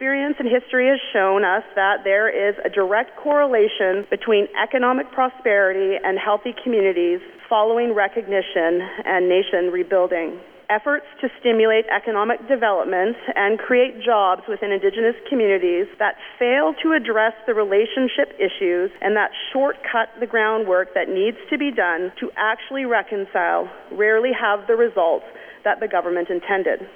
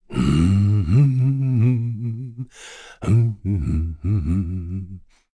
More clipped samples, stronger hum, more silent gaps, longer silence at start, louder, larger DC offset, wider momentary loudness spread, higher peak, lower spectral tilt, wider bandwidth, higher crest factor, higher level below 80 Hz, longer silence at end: neither; neither; neither; about the same, 0 s vs 0.1 s; about the same, -20 LUFS vs -20 LUFS; neither; second, 5 LU vs 17 LU; about the same, -6 dBFS vs -6 dBFS; second, -6.5 dB/octave vs -8.5 dB/octave; second, 4.5 kHz vs 10.5 kHz; about the same, 14 dB vs 12 dB; second, -64 dBFS vs -34 dBFS; second, 0.05 s vs 0.35 s